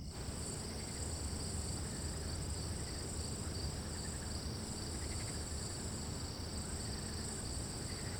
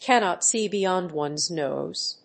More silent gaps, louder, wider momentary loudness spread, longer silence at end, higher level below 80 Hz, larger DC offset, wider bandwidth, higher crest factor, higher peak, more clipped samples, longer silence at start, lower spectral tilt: neither; second, -42 LUFS vs -24 LUFS; second, 1 LU vs 7 LU; about the same, 0 s vs 0.1 s; first, -50 dBFS vs -74 dBFS; neither; first, over 20 kHz vs 8.8 kHz; second, 14 dB vs 20 dB; second, -28 dBFS vs -6 dBFS; neither; about the same, 0 s vs 0 s; first, -4 dB/octave vs -2.5 dB/octave